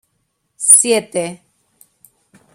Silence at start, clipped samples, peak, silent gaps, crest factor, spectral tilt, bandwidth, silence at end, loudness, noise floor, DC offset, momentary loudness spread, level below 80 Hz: 0.6 s; 0.2%; 0 dBFS; none; 18 dB; -1.5 dB/octave; 16 kHz; 1.2 s; -11 LUFS; -68 dBFS; under 0.1%; 15 LU; -66 dBFS